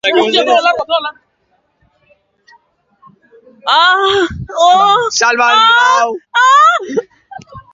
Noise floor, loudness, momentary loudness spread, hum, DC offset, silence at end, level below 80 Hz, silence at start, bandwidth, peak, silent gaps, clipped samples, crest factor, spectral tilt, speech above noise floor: -60 dBFS; -10 LUFS; 10 LU; none; under 0.1%; 0.15 s; -46 dBFS; 0.05 s; 7.8 kHz; 0 dBFS; none; under 0.1%; 12 dB; -2 dB/octave; 50 dB